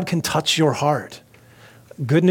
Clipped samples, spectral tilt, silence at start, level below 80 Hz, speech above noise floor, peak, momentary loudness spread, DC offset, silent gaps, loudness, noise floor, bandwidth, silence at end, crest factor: under 0.1%; -5 dB/octave; 0 s; -58 dBFS; 29 dB; -4 dBFS; 12 LU; under 0.1%; none; -20 LUFS; -48 dBFS; 17.5 kHz; 0 s; 16 dB